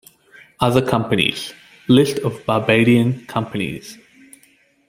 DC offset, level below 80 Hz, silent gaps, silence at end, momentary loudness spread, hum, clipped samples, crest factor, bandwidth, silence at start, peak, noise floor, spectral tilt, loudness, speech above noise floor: under 0.1%; -52 dBFS; none; 0.95 s; 17 LU; none; under 0.1%; 18 dB; 16.5 kHz; 0.6 s; -2 dBFS; -56 dBFS; -6 dB/octave; -18 LUFS; 39 dB